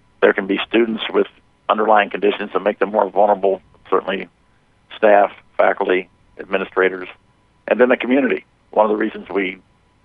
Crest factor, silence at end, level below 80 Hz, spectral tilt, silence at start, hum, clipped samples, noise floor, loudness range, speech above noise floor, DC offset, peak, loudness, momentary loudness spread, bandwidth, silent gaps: 18 dB; 0.5 s; -60 dBFS; -8 dB/octave; 0.2 s; none; under 0.1%; -56 dBFS; 2 LU; 40 dB; under 0.1%; 0 dBFS; -18 LUFS; 11 LU; 4.7 kHz; none